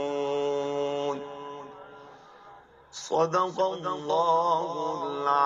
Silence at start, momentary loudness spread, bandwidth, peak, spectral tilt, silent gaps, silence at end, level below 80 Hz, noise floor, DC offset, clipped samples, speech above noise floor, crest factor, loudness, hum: 0 s; 19 LU; 7.8 kHz; -10 dBFS; -4.5 dB/octave; none; 0 s; -72 dBFS; -52 dBFS; under 0.1%; under 0.1%; 26 dB; 18 dB; -28 LUFS; none